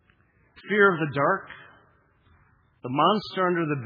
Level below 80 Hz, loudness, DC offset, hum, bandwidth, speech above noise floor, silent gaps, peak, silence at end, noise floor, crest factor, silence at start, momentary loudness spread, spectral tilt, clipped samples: -68 dBFS; -24 LUFS; under 0.1%; none; 5.2 kHz; 39 dB; none; -6 dBFS; 0 s; -63 dBFS; 22 dB; 0.65 s; 20 LU; -8 dB/octave; under 0.1%